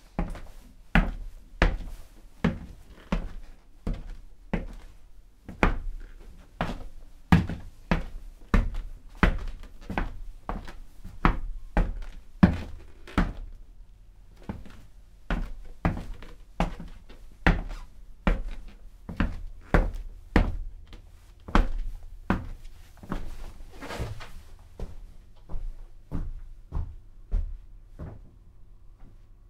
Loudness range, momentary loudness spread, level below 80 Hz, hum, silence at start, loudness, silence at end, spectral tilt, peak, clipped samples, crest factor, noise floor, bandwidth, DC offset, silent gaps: 11 LU; 23 LU; -34 dBFS; none; 0.05 s; -31 LUFS; 0 s; -7 dB/octave; 0 dBFS; under 0.1%; 30 dB; -49 dBFS; 9.8 kHz; under 0.1%; none